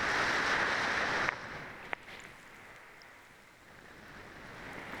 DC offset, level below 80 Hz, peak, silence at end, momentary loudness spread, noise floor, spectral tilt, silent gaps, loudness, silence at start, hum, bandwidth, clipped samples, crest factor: under 0.1%; -62 dBFS; -10 dBFS; 0 s; 24 LU; -57 dBFS; -2.5 dB/octave; none; -33 LUFS; 0 s; none; over 20 kHz; under 0.1%; 26 dB